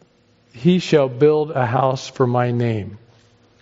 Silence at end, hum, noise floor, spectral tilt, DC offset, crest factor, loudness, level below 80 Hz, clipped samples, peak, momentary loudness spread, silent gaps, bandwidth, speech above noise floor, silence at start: 0.65 s; none; -57 dBFS; -6.5 dB/octave; under 0.1%; 16 dB; -18 LUFS; -60 dBFS; under 0.1%; -4 dBFS; 7 LU; none; 7.8 kHz; 39 dB; 0.55 s